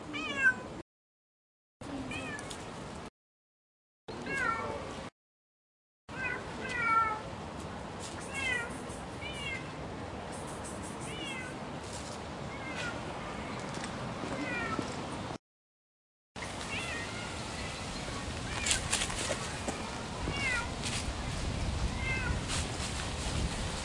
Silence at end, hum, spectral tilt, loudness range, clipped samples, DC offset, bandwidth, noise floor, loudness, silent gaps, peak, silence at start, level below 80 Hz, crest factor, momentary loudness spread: 0 s; none; -3.5 dB/octave; 6 LU; under 0.1%; under 0.1%; 11.5 kHz; under -90 dBFS; -36 LUFS; 0.82-1.80 s, 3.09-4.08 s, 5.12-6.08 s, 15.39-16.35 s; -10 dBFS; 0 s; -48 dBFS; 28 dB; 12 LU